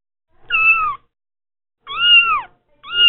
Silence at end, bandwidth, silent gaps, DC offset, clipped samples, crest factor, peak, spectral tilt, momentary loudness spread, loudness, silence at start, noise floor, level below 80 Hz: 0 s; 4.2 kHz; none; under 0.1%; under 0.1%; 16 dB; -2 dBFS; 6 dB/octave; 16 LU; -13 LUFS; 0.5 s; -39 dBFS; -50 dBFS